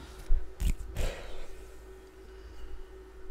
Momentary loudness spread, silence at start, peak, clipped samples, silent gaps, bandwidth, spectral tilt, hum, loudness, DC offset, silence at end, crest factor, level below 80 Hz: 15 LU; 0 s; -14 dBFS; under 0.1%; none; 14.5 kHz; -5 dB/octave; none; -41 LUFS; under 0.1%; 0 s; 20 dB; -34 dBFS